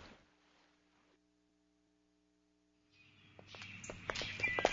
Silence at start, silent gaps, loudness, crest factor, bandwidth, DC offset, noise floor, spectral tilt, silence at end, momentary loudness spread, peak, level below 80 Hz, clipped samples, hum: 0 s; none; -41 LUFS; 32 dB; 7.4 kHz; under 0.1%; -77 dBFS; -1.5 dB/octave; 0 s; 25 LU; -14 dBFS; -68 dBFS; under 0.1%; 60 Hz at -85 dBFS